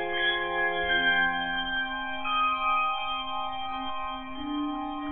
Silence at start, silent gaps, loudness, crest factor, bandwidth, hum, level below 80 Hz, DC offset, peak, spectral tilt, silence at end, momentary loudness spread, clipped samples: 0 s; none; -28 LUFS; 16 dB; 4.2 kHz; none; -52 dBFS; under 0.1%; -14 dBFS; -6.5 dB/octave; 0 s; 10 LU; under 0.1%